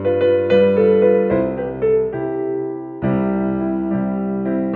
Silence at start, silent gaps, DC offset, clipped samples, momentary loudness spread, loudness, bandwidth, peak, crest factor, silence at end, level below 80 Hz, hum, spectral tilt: 0 s; none; under 0.1%; under 0.1%; 9 LU; -18 LUFS; 4.3 kHz; -4 dBFS; 14 dB; 0 s; -46 dBFS; none; -10.5 dB/octave